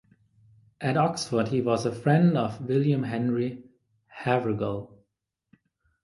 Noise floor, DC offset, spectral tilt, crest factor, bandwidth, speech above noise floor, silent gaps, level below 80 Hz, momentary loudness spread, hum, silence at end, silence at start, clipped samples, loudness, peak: -81 dBFS; under 0.1%; -7 dB/octave; 20 dB; 11.5 kHz; 56 dB; none; -62 dBFS; 11 LU; none; 1.15 s; 0.8 s; under 0.1%; -26 LUFS; -8 dBFS